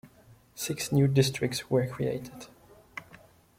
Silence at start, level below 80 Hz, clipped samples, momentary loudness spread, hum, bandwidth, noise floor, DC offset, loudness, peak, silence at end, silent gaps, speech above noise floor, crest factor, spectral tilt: 0.05 s; -62 dBFS; under 0.1%; 22 LU; none; 16.5 kHz; -58 dBFS; under 0.1%; -28 LUFS; -10 dBFS; 0.4 s; none; 30 dB; 20 dB; -5.5 dB/octave